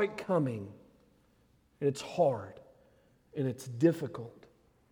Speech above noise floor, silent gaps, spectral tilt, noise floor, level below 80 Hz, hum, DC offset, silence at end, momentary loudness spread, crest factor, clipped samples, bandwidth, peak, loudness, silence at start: 36 dB; none; -7 dB/octave; -68 dBFS; -72 dBFS; none; under 0.1%; 0.6 s; 17 LU; 20 dB; under 0.1%; 18.5 kHz; -14 dBFS; -33 LUFS; 0 s